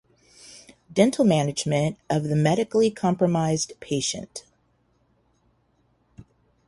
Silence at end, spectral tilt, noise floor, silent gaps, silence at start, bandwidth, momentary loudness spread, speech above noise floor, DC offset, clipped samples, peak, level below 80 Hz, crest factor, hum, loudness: 0.45 s; -5.5 dB/octave; -66 dBFS; none; 0.5 s; 11.5 kHz; 19 LU; 44 dB; under 0.1%; under 0.1%; -4 dBFS; -60 dBFS; 20 dB; none; -23 LUFS